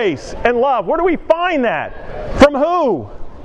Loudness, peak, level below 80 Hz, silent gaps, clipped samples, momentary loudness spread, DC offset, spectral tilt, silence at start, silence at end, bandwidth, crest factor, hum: -15 LUFS; 0 dBFS; -34 dBFS; none; 0.2%; 14 LU; under 0.1%; -5.5 dB/octave; 0 s; 0 s; 11.5 kHz; 16 dB; none